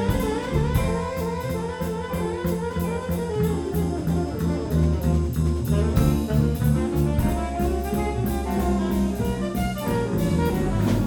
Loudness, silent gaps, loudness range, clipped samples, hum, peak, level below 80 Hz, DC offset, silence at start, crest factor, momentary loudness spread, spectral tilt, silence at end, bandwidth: -24 LUFS; none; 3 LU; under 0.1%; none; -6 dBFS; -30 dBFS; under 0.1%; 0 s; 16 dB; 5 LU; -7 dB/octave; 0 s; over 20 kHz